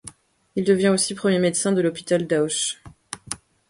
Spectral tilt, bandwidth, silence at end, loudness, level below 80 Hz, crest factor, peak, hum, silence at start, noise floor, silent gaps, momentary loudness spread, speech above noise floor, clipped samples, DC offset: -4 dB/octave; 11.5 kHz; 0.35 s; -21 LUFS; -60 dBFS; 20 dB; -2 dBFS; none; 0.05 s; -46 dBFS; none; 18 LU; 25 dB; under 0.1%; under 0.1%